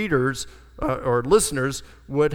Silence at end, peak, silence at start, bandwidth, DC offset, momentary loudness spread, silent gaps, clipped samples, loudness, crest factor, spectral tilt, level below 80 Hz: 0 s; -4 dBFS; 0 s; 18 kHz; under 0.1%; 14 LU; none; under 0.1%; -23 LUFS; 18 dB; -4.5 dB/octave; -42 dBFS